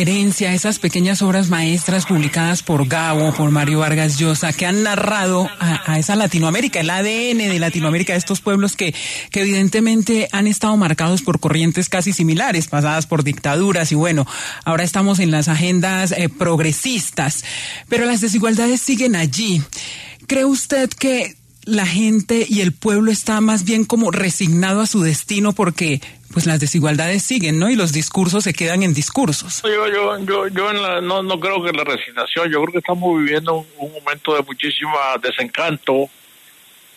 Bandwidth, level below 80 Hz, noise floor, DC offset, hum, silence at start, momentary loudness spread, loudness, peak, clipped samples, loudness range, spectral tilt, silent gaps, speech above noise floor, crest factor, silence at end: 13.5 kHz; -54 dBFS; -46 dBFS; under 0.1%; none; 0 s; 4 LU; -17 LUFS; -4 dBFS; under 0.1%; 2 LU; -4.5 dB/octave; none; 30 dB; 12 dB; 0.9 s